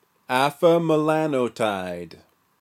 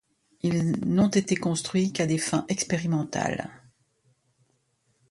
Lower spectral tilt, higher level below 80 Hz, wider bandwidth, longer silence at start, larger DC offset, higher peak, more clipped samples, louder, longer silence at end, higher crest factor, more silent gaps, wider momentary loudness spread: about the same, -6 dB/octave vs -5 dB/octave; second, -70 dBFS vs -58 dBFS; first, 16 kHz vs 11.5 kHz; second, 0.3 s vs 0.45 s; neither; first, -4 dBFS vs -10 dBFS; neither; first, -22 LUFS vs -26 LUFS; second, 0.55 s vs 1.55 s; about the same, 18 dB vs 18 dB; neither; first, 14 LU vs 7 LU